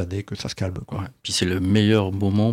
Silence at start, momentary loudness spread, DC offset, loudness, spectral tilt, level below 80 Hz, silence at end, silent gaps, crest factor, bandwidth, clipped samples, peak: 0 s; 13 LU; under 0.1%; -23 LUFS; -5.5 dB/octave; -48 dBFS; 0 s; none; 16 dB; 14.5 kHz; under 0.1%; -6 dBFS